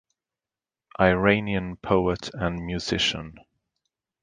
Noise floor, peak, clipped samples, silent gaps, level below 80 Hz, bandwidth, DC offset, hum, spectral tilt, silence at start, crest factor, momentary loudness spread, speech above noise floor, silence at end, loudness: under -90 dBFS; -4 dBFS; under 0.1%; none; -46 dBFS; 9.6 kHz; under 0.1%; none; -5 dB/octave; 1 s; 24 dB; 12 LU; over 66 dB; 0.9 s; -24 LUFS